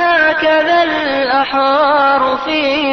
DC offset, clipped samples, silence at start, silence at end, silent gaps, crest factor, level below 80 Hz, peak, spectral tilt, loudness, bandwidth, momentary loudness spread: 0.2%; under 0.1%; 0 s; 0 s; none; 10 dB; -48 dBFS; -2 dBFS; -4.5 dB/octave; -12 LUFS; 6.4 kHz; 4 LU